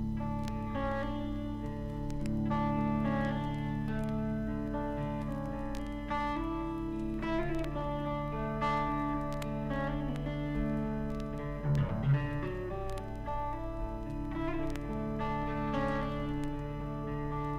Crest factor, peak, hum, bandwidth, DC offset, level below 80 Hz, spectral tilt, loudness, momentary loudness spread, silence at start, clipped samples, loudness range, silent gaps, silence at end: 14 dB; -20 dBFS; none; 13 kHz; under 0.1%; -42 dBFS; -8 dB/octave; -35 LUFS; 7 LU; 0 s; under 0.1%; 2 LU; none; 0 s